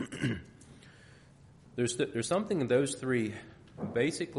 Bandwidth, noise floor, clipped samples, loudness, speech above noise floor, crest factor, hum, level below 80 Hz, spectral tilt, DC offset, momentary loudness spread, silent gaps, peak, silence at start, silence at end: 11.5 kHz; -57 dBFS; under 0.1%; -32 LUFS; 26 dB; 18 dB; none; -64 dBFS; -5 dB/octave; under 0.1%; 15 LU; none; -16 dBFS; 0 s; 0 s